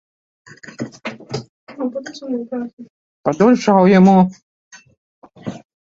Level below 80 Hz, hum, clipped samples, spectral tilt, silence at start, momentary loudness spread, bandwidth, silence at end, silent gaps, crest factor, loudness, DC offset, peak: -58 dBFS; none; under 0.1%; -7.5 dB/octave; 0.65 s; 22 LU; 7.4 kHz; 0.3 s; 1.49-1.67 s, 2.73-2.77 s, 2.90-3.24 s, 4.43-4.71 s, 4.97-5.22 s; 16 dB; -15 LUFS; under 0.1%; -2 dBFS